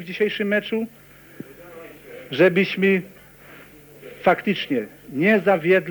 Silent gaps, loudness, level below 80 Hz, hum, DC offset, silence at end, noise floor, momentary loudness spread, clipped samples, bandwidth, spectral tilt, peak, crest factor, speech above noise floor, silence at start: none; -21 LUFS; -62 dBFS; none; under 0.1%; 0 s; -45 dBFS; 24 LU; under 0.1%; over 20 kHz; -7 dB/octave; -4 dBFS; 18 dB; 25 dB; 0 s